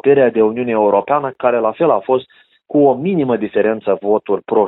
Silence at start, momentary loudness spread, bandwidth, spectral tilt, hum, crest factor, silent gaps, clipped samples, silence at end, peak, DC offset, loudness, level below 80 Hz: 0.05 s; 5 LU; 4.1 kHz; -11.5 dB/octave; none; 14 dB; none; under 0.1%; 0 s; -2 dBFS; under 0.1%; -15 LUFS; -60 dBFS